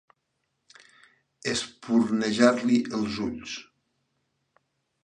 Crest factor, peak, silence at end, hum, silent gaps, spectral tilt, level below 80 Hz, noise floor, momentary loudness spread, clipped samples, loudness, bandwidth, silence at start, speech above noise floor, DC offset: 24 dB; -4 dBFS; 1.4 s; none; none; -4.5 dB/octave; -62 dBFS; -78 dBFS; 14 LU; under 0.1%; -26 LUFS; 10 kHz; 1.45 s; 53 dB; under 0.1%